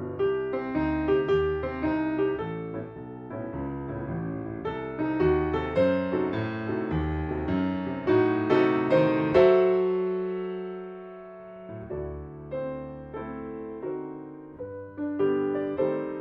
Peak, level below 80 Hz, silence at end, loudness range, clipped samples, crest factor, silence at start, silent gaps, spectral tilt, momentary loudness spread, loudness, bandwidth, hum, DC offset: -8 dBFS; -46 dBFS; 0 s; 13 LU; under 0.1%; 20 dB; 0 s; none; -9 dB/octave; 17 LU; -27 LUFS; 5.6 kHz; none; under 0.1%